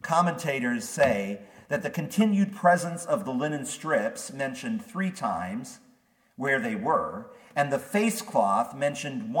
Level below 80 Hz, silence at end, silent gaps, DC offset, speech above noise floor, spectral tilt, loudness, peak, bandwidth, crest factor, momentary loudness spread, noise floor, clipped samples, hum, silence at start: -68 dBFS; 0 s; none; under 0.1%; 36 dB; -5 dB/octave; -27 LUFS; -6 dBFS; 18 kHz; 20 dB; 10 LU; -63 dBFS; under 0.1%; none; 0.05 s